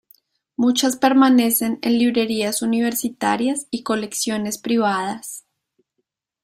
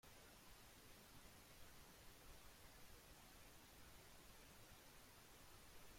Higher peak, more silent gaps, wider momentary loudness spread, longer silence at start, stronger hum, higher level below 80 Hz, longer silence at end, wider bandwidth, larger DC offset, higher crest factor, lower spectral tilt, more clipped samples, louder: first, -2 dBFS vs -48 dBFS; neither; first, 11 LU vs 0 LU; first, 0.6 s vs 0.05 s; neither; first, -64 dBFS vs -72 dBFS; first, 1.05 s vs 0 s; about the same, 16 kHz vs 16.5 kHz; neither; about the same, 18 dB vs 16 dB; about the same, -3.5 dB/octave vs -2.5 dB/octave; neither; first, -19 LUFS vs -64 LUFS